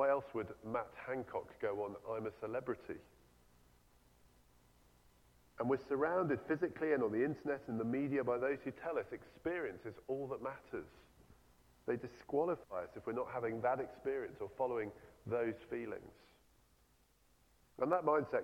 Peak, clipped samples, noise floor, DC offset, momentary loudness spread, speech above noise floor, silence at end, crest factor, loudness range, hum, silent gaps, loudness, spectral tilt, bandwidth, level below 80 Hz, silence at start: -20 dBFS; under 0.1%; -72 dBFS; under 0.1%; 11 LU; 32 dB; 0 s; 22 dB; 8 LU; none; none; -40 LUFS; -8 dB/octave; 16 kHz; -72 dBFS; 0 s